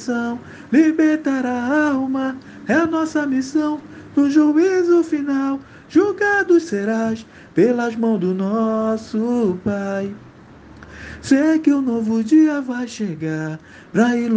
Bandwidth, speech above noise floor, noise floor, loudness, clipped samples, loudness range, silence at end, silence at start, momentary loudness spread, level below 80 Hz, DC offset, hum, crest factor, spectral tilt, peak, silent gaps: 9 kHz; 25 dB; -43 dBFS; -18 LUFS; under 0.1%; 3 LU; 0 s; 0 s; 12 LU; -56 dBFS; under 0.1%; none; 16 dB; -6.5 dB/octave; -2 dBFS; none